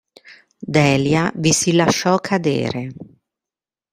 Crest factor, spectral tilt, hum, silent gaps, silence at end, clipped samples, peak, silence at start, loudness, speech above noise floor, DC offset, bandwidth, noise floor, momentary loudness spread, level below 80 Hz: 18 dB; -4.5 dB/octave; none; none; 0.9 s; under 0.1%; -2 dBFS; 0.25 s; -17 LUFS; 73 dB; under 0.1%; 16 kHz; -90 dBFS; 11 LU; -54 dBFS